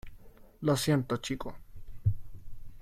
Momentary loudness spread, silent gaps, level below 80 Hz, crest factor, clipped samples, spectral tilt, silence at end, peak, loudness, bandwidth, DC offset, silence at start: 18 LU; none; -48 dBFS; 18 dB; under 0.1%; -5.5 dB/octave; 0 s; -16 dBFS; -32 LUFS; 16.5 kHz; under 0.1%; 0.05 s